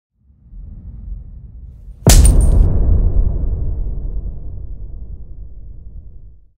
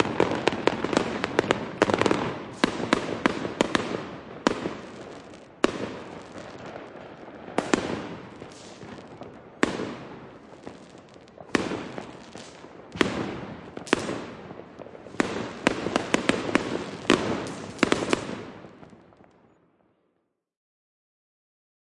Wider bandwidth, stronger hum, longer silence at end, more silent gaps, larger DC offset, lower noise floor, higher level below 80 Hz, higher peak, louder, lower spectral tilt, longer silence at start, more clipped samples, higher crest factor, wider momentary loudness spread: first, 16 kHz vs 11.5 kHz; neither; second, 0.3 s vs 3 s; neither; neither; second, -39 dBFS vs -75 dBFS; first, -18 dBFS vs -58 dBFS; about the same, 0 dBFS vs -2 dBFS; first, -16 LUFS vs -27 LUFS; about the same, -5 dB/octave vs -4.5 dB/octave; first, 0.35 s vs 0 s; neither; second, 16 dB vs 28 dB; first, 26 LU vs 19 LU